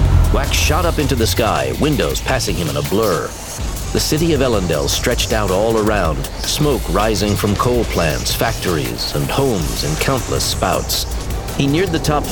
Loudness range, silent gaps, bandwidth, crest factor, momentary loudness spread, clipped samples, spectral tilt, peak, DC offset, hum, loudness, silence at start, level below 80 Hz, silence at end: 1 LU; none; over 20 kHz; 16 dB; 4 LU; under 0.1%; -4.5 dB/octave; -2 dBFS; 0.4%; none; -17 LUFS; 0 s; -24 dBFS; 0 s